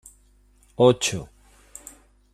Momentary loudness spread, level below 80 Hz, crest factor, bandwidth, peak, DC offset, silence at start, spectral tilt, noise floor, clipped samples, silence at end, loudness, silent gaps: 27 LU; -54 dBFS; 22 dB; 15 kHz; -4 dBFS; under 0.1%; 0.8 s; -4.5 dB/octave; -57 dBFS; under 0.1%; 1.1 s; -21 LUFS; none